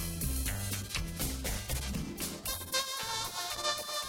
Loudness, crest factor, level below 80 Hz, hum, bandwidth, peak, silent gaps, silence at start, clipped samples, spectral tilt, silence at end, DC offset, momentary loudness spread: -35 LUFS; 20 dB; -42 dBFS; none; 17.5 kHz; -16 dBFS; none; 0 s; under 0.1%; -2.5 dB/octave; 0 s; under 0.1%; 4 LU